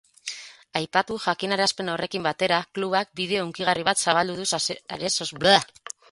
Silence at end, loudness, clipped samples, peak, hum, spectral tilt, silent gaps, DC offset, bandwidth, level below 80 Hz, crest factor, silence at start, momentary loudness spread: 0.2 s; -24 LUFS; under 0.1%; 0 dBFS; none; -2.5 dB/octave; none; under 0.1%; 11.5 kHz; -62 dBFS; 24 dB; 0.25 s; 12 LU